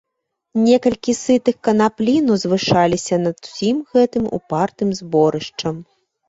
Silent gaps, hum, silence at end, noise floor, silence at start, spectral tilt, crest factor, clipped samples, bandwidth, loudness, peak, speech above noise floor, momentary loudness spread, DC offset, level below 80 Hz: none; none; 0.45 s; -77 dBFS; 0.55 s; -5.5 dB/octave; 16 dB; under 0.1%; 8 kHz; -18 LUFS; -2 dBFS; 60 dB; 9 LU; under 0.1%; -52 dBFS